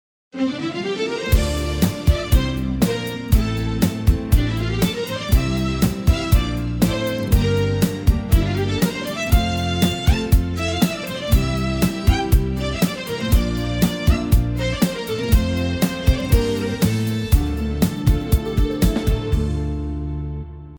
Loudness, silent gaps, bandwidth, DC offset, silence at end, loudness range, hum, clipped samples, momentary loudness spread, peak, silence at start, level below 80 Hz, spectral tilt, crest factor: -20 LUFS; none; over 20 kHz; under 0.1%; 0 s; 1 LU; none; under 0.1%; 6 LU; -4 dBFS; 0.35 s; -22 dBFS; -6 dB/octave; 16 dB